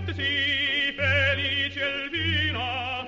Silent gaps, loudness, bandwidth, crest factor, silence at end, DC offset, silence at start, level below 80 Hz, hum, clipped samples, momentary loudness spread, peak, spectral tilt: none; -24 LUFS; 7.8 kHz; 16 dB; 0 s; under 0.1%; 0 s; -50 dBFS; none; under 0.1%; 5 LU; -10 dBFS; -5 dB/octave